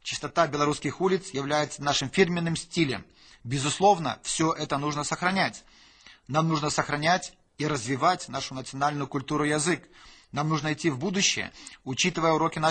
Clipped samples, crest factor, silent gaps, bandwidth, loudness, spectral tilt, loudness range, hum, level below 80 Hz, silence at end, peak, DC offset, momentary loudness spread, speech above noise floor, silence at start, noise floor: under 0.1%; 20 dB; none; 9.2 kHz; -27 LUFS; -4 dB/octave; 2 LU; none; -58 dBFS; 0 s; -6 dBFS; under 0.1%; 9 LU; 27 dB; 0.05 s; -54 dBFS